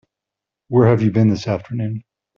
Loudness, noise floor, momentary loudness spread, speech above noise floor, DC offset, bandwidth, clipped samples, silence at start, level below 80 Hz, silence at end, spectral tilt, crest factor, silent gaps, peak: -18 LUFS; -85 dBFS; 11 LU; 69 dB; under 0.1%; 7 kHz; under 0.1%; 0.7 s; -52 dBFS; 0.35 s; -8.5 dB/octave; 16 dB; none; -2 dBFS